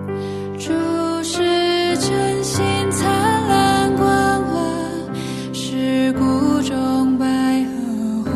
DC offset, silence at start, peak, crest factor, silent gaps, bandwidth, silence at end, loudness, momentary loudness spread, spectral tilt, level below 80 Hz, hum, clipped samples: under 0.1%; 0 s; -4 dBFS; 14 dB; none; 14 kHz; 0 s; -18 LUFS; 10 LU; -5 dB/octave; -46 dBFS; none; under 0.1%